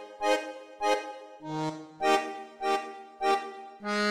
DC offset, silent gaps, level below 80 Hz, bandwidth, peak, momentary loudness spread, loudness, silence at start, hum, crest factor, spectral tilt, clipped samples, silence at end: under 0.1%; none; -72 dBFS; 15 kHz; -12 dBFS; 15 LU; -31 LUFS; 0 s; none; 18 dB; -3.5 dB/octave; under 0.1%; 0 s